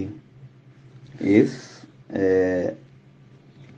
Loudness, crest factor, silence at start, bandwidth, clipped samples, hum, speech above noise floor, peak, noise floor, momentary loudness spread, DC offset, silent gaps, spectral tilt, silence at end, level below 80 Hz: -22 LUFS; 22 dB; 0 s; 8.2 kHz; under 0.1%; none; 30 dB; -2 dBFS; -50 dBFS; 25 LU; under 0.1%; none; -7.5 dB/octave; 0.15 s; -54 dBFS